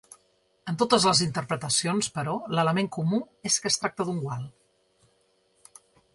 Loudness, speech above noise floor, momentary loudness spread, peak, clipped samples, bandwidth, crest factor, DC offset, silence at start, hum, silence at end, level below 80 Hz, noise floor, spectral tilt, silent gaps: -26 LUFS; 41 dB; 13 LU; -6 dBFS; under 0.1%; 11.5 kHz; 22 dB; under 0.1%; 0.65 s; none; 1.65 s; -66 dBFS; -67 dBFS; -3.5 dB/octave; none